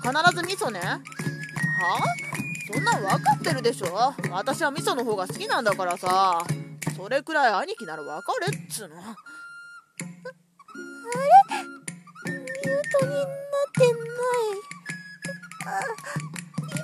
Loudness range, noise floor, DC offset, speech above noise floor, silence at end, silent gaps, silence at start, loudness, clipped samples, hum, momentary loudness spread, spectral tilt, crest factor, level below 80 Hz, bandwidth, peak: 5 LU; -46 dBFS; under 0.1%; 21 dB; 0 s; none; 0 s; -25 LUFS; under 0.1%; none; 17 LU; -4.5 dB/octave; 22 dB; -70 dBFS; 14 kHz; -4 dBFS